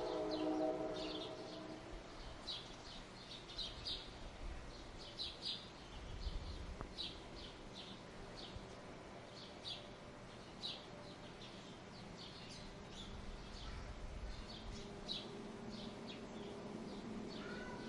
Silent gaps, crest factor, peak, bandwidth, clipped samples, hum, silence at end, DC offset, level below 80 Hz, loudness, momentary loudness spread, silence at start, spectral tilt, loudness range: none; 20 dB; -28 dBFS; 11.5 kHz; under 0.1%; none; 0 s; under 0.1%; -56 dBFS; -49 LUFS; 10 LU; 0 s; -4.5 dB/octave; 4 LU